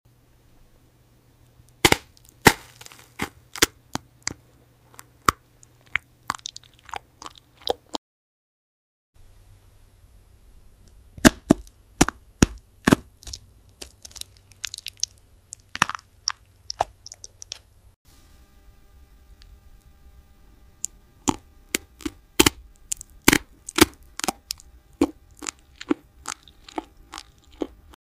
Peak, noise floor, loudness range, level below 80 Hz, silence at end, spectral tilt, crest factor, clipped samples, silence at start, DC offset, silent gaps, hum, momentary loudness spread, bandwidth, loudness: 0 dBFS; -57 dBFS; 14 LU; -44 dBFS; 0.4 s; -3 dB/octave; 28 dB; under 0.1%; 1.85 s; under 0.1%; 7.98-9.13 s, 17.96-18.05 s; none; 22 LU; 16 kHz; -25 LUFS